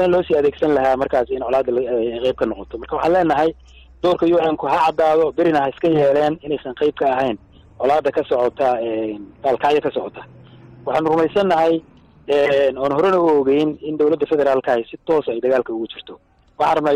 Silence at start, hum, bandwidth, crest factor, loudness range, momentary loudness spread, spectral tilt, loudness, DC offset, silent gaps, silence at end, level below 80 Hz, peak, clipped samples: 0 s; none; 10 kHz; 10 dB; 3 LU; 8 LU; -7 dB/octave; -18 LUFS; under 0.1%; none; 0 s; -48 dBFS; -8 dBFS; under 0.1%